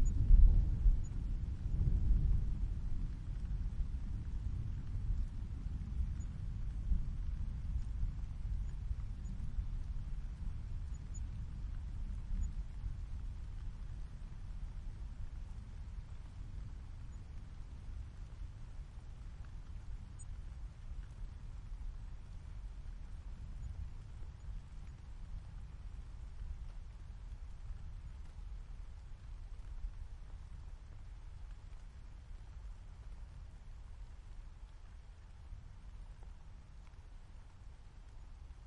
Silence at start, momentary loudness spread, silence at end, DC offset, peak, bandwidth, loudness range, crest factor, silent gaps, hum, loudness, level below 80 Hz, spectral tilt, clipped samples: 0 s; 15 LU; 0 s; under 0.1%; -14 dBFS; 7.4 kHz; 15 LU; 24 dB; none; none; -44 LUFS; -40 dBFS; -7.5 dB/octave; under 0.1%